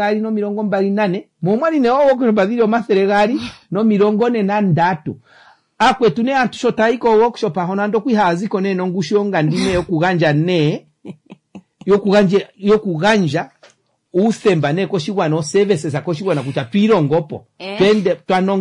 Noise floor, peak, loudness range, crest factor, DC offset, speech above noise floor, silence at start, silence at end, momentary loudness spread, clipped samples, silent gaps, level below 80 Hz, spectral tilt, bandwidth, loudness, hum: -52 dBFS; -4 dBFS; 2 LU; 12 dB; under 0.1%; 36 dB; 0 s; 0 s; 7 LU; under 0.1%; none; -50 dBFS; -6.5 dB/octave; 10.5 kHz; -16 LUFS; none